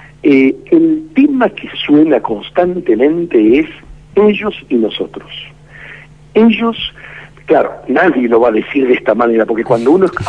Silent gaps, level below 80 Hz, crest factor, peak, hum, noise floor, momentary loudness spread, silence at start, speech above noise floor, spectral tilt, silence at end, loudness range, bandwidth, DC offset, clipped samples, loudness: none; -44 dBFS; 12 dB; 0 dBFS; none; -35 dBFS; 16 LU; 0.25 s; 24 dB; -7.5 dB/octave; 0 s; 4 LU; 8 kHz; 0.3%; under 0.1%; -12 LUFS